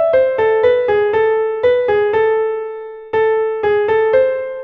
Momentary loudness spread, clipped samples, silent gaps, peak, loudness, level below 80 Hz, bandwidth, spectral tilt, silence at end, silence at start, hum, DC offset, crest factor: 7 LU; under 0.1%; none; -2 dBFS; -15 LUFS; -50 dBFS; 4.8 kHz; -6.5 dB/octave; 0 s; 0 s; none; under 0.1%; 12 dB